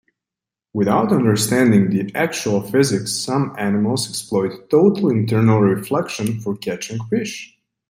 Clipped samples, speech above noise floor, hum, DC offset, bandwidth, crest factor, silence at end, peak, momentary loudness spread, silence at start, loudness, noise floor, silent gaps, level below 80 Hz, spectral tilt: under 0.1%; 70 dB; none; under 0.1%; 16 kHz; 16 dB; 0.45 s; -2 dBFS; 10 LU; 0.75 s; -18 LUFS; -87 dBFS; none; -58 dBFS; -5.5 dB/octave